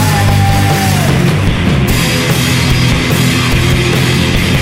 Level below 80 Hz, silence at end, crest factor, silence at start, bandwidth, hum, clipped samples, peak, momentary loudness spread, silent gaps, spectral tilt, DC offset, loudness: -22 dBFS; 0 s; 10 dB; 0 s; 16.5 kHz; none; under 0.1%; 0 dBFS; 1 LU; none; -5 dB/octave; under 0.1%; -10 LUFS